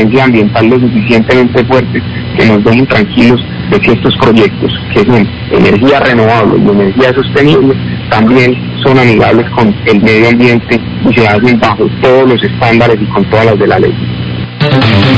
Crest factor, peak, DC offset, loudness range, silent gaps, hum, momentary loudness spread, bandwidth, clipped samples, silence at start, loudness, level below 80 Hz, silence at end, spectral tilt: 6 dB; 0 dBFS; 0.5%; 1 LU; none; none; 6 LU; 8 kHz; 5%; 0 s; -7 LUFS; -30 dBFS; 0 s; -7.5 dB/octave